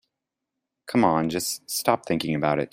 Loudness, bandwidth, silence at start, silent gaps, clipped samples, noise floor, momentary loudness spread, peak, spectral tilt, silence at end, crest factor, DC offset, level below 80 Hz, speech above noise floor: -24 LUFS; 16.5 kHz; 0.85 s; none; under 0.1%; -84 dBFS; 6 LU; -4 dBFS; -4.5 dB/octave; 0.05 s; 20 dB; under 0.1%; -60 dBFS; 61 dB